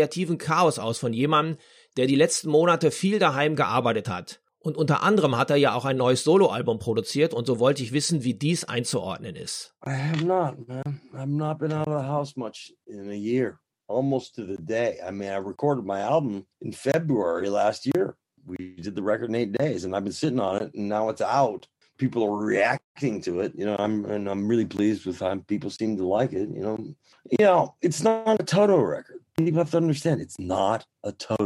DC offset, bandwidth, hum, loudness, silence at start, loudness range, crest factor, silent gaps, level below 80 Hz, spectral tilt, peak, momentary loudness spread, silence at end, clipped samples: under 0.1%; 15.5 kHz; none; -25 LUFS; 0 s; 6 LU; 18 dB; 22.84-22.95 s; -66 dBFS; -5.5 dB/octave; -8 dBFS; 13 LU; 0 s; under 0.1%